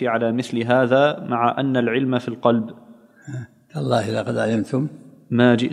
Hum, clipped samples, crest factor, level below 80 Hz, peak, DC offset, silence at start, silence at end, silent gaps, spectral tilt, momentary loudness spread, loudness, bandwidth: none; under 0.1%; 20 dB; -68 dBFS; -2 dBFS; under 0.1%; 0 s; 0 s; none; -7 dB/octave; 17 LU; -20 LUFS; 11 kHz